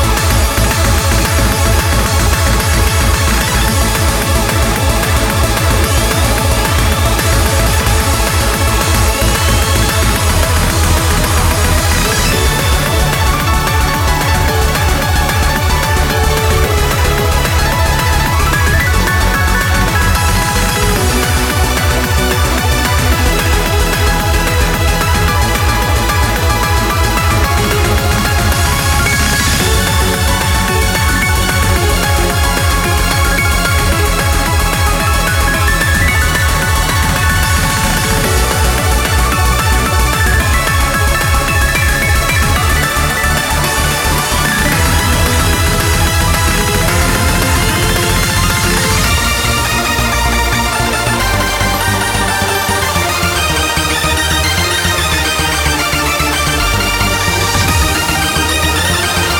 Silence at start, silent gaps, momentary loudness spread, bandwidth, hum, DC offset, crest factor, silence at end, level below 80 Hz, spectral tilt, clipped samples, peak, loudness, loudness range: 0 s; none; 1 LU; 19 kHz; none; under 0.1%; 12 dB; 0 s; -18 dBFS; -3.5 dB/octave; under 0.1%; 0 dBFS; -12 LUFS; 1 LU